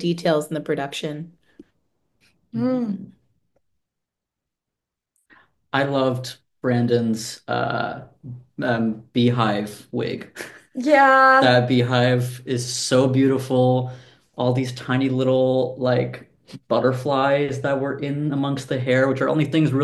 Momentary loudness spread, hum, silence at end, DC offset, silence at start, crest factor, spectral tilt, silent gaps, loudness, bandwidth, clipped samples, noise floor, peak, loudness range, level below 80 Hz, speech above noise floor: 14 LU; none; 0 s; under 0.1%; 0 s; 20 dB; -6 dB/octave; none; -21 LUFS; 12.5 kHz; under 0.1%; -84 dBFS; -2 dBFS; 14 LU; -64 dBFS; 64 dB